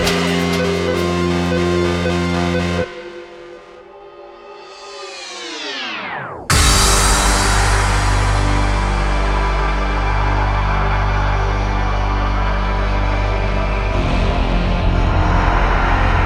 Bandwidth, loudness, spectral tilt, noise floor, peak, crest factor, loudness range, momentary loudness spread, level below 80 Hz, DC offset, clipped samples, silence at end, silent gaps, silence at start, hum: 15 kHz; -17 LUFS; -4.5 dB/octave; -38 dBFS; 0 dBFS; 16 dB; 9 LU; 17 LU; -20 dBFS; under 0.1%; under 0.1%; 0 s; none; 0 s; none